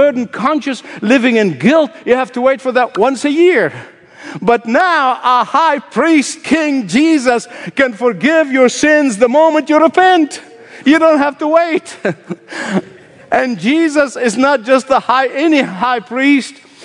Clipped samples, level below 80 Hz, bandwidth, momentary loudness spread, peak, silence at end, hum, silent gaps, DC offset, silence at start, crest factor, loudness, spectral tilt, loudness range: under 0.1%; -56 dBFS; 11 kHz; 9 LU; 0 dBFS; 0.3 s; none; none; under 0.1%; 0 s; 12 dB; -12 LUFS; -4.5 dB/octave; 4 LU